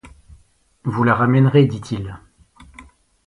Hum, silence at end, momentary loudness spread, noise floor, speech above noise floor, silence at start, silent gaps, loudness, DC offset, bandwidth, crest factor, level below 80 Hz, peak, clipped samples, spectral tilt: none; 0.45 s; 15 LU; -54 dBFS; 38 dB; 0.05 s; none; -17 LUFS; under 0.1%; 10.5 kHz; 18 dB; -48 dBFS; -2 dBFS; under 0.1%; -8.5 dB/octave